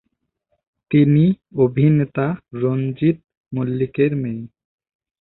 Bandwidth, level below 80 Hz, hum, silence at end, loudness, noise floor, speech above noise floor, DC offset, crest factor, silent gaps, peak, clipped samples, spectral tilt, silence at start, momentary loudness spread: 4.1 kHz; -54 dBFS; none; 0.75 s; -19 LUFS; -74 dBFS; 56 dB; under 0.1%; 16 dB; 3.37-3.44 s; -4 dBFS; under 0.1%; -13.5 dB/octave; 0.9 s; 11 LU